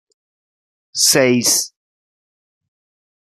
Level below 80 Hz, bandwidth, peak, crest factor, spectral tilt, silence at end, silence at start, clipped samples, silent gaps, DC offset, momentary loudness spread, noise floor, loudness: -68 dBFS; 14 kHz; -2 dBFS; 20 dB; -2 dB/octave; 1.55 s; 0.95 s; under 0.1%; none; under 0.1%; 15 LU; under -90 dBFS; -13 LUFS